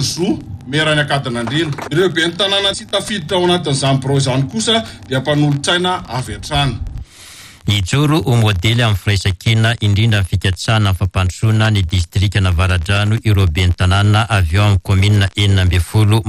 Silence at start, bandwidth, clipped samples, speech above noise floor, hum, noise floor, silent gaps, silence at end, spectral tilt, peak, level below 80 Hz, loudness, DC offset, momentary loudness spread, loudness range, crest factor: 0 s; 14.5 kHz; under 0.1%; 24 dB; none; -38 dBFS; none; 0 s; -5 dB/octave; -2 dBFS; -30 dBFS; -15 LUFS; under 0.1%; 6 LU; 3 LU; 12 dB